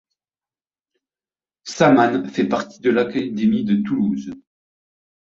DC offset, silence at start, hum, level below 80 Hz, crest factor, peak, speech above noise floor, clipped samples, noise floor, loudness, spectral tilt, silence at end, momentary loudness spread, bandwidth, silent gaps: under 0.1%; 1.65 s; none; -60 dBFS; 20 dB; -2 dBFS; over 72 dB; under 0.1%; under -90 dBFS; -19 LUFS; -6.5 dB/octave; 0.85 s; 14 LU; 7.8 kHz; none